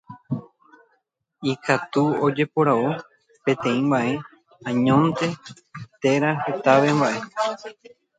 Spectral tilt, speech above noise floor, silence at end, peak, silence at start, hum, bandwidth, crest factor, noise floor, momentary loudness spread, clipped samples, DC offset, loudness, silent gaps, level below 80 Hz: -6.5 dB/octave; 49 dB; 0.45 s; -2 dBFS; 0.1 s; none; 9.2 kHz; 20 dB; -70 dBFS; 15 LU; under 0.1%; under 0.1%; -22 LUFS; none; -64 dBFS